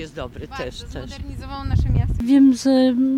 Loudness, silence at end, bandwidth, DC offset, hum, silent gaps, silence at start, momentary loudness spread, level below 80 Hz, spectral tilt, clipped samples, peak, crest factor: -17 LUFS; 0 s; 11 kHz; under 0.1%; none; none; 0 s; 19 LU; -30 dBFS; -7 dB/octave; under 0.1%; -6 dBFS; 12 dB